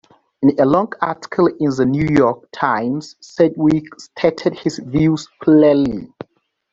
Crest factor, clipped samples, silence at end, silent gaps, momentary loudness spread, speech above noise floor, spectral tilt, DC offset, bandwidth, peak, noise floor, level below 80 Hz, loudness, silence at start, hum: 16 dB; under 0.1%; 0.65 s; none; 10 LU; 41 dB; -7.5 dB/octave; under 0.1%; 7.8 kHz; -2 dBFS; -57 dBFS; -48 dBFS; -17 LUFS; 0.4 s; none